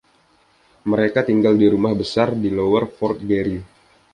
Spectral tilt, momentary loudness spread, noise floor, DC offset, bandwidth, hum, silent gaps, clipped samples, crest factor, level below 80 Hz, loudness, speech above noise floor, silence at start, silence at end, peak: -7.5 dB/octave; 9 LU; -58 dBFS; under 0.1%; 10 kHz; none; none; under 0.1%; 16 dB; -48 dBFS; -19 LUFS; 40 dB; 0.85 s; 0.5 s; -2 dBFS